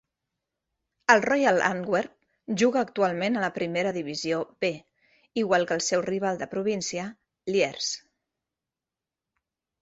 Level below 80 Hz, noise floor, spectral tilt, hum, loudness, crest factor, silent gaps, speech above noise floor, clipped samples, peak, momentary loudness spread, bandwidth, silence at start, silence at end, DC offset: -70 dBFS; -89 dBFS; -4 dB/octave; none; -26 LUFS; 26 dB; none; 64 dB; under 0.1%; -2 dBFS; 12 LU; 8.2 kHz; 1.1 s; 1.85 s; under 0.1%